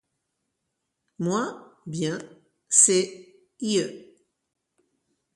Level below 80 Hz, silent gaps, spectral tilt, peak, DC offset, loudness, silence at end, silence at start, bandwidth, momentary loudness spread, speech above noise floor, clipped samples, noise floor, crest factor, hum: -74 dBFS; none; -3 dB/octave; 0 dBFS; under 0.1%; -23 LUFS; 1.3 s; 1.2 s; 11.5 kHz; 19 LU; 56 dB; under 0.1%; -80 dBFS; 28 dB; none